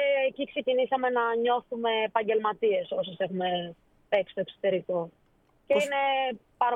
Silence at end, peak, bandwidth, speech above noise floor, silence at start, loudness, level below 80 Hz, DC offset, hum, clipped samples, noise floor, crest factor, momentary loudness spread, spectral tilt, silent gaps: 0 s; -10 dBFS; 11 kHz; 38 dB; 0 s; -28 LUFS; -72 dBFS; under 0.1%; none; under 0.1%; -65 dBFS; 18 dB; 7 LU; -5 dB/octave; none